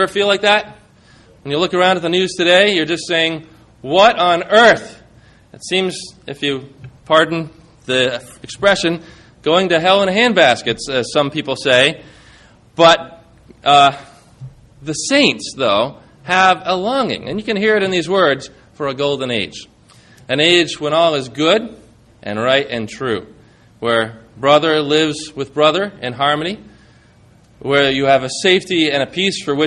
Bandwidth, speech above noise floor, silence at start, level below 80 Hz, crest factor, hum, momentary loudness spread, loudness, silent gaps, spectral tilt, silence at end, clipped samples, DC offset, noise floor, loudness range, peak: 11.5 kHz; 33 dB; 0 s; -52 dBFS; 16 dB; none; 15 LU; -15 LUFS; none; -4 dB/octave; 0 s; under 0.1%; under 0.1%; -48 dBFS; 4 LU; 0 dBFS